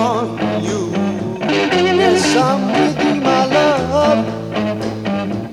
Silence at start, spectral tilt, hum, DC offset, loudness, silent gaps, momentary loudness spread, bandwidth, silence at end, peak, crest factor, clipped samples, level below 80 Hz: 0 s; -5 dB/octave; none; under 0.1%; -16 LUFS; none; 8 LU; 13.5 kHz; 0 s; 0 dBFS; 14 dB; under 0.1%; -46 dBFS